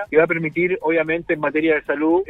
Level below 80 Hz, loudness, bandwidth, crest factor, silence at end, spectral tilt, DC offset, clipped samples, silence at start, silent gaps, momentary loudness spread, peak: -54 dBFS; -19 LUFS; 4.1 kHz; 16 dB; 0.05 s; -8.5 dB/octave; under 0.1%; under 0.1%; 0 s; none; 4 LU; -2 dBFS